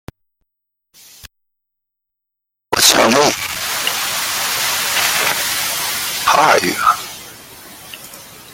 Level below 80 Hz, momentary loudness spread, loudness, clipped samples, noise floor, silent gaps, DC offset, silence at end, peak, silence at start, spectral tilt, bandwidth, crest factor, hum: -52 dBFS; 22 LU; -14 LUFS; under 0.1%; -80 dBFS; none; under 0.1%; 0 s; 0 dBFS; 1.25 s; -1 dB/octave; 17 kHz; 18 dB; none